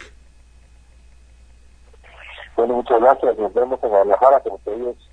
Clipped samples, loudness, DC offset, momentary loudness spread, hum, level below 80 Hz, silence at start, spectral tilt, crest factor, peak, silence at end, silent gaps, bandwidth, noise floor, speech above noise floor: under 0.1%; -18 LUFS; under 0.1%; 13 LU; none; -48 dBFS; 0 s; -6.5 dB/octave; 18 dB; 0 dBFS; 0.2 s; none; 9 kHz; -48 dBFS; 31 dB